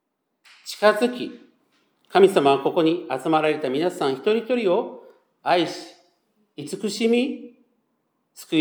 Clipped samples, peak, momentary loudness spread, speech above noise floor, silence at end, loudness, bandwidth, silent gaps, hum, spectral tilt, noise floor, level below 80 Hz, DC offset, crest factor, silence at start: under 0.1%; -2 dBFS; 17 LU; 51 dB; 0 s; -22 LUFS; over 20 kHz; none; none; -5 dB/octave; -72 dBFS; -84 dBFS; under 0.1%; 20 dB; 0.65 s